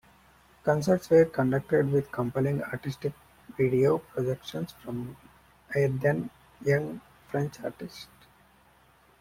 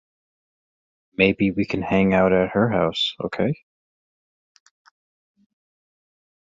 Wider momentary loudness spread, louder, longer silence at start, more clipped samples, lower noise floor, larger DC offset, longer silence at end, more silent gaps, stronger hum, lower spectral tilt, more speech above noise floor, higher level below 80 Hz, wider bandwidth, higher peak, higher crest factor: first, 17 LU vs 8 LU; second, -28 LUFS vs -21 LUFS; second, 0.65 s vs 1.2 s; neither; second, -61 dBFS vs under -90 dBFS; neither; second, 1.15 s vs 3.05 s; neither; neither; about the same, -7.5 dB/octave vs -7 dB/octave; second, 34 dB vs over 70 dB; second, -60 dBFS vs -50 dBFS; first, 16.5 kHz vs 7.6 kHz; second, -10 dBFS vs -2 dBFS; about the same, 18 dB vs 22 dB